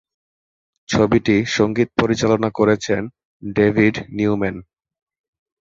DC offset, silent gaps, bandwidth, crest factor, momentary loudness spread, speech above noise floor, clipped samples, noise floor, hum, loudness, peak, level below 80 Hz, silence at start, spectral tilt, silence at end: under 0.1%; 3.25-3.40 s; 7.8 kHz; 18 dB; 10 LU; over 73 dB; under 0.1%; under -90 dBFS; none; -18 LUFS; -2 dBFS; -46 dBFS; 0.9 s; -6 dB/octave; 1 s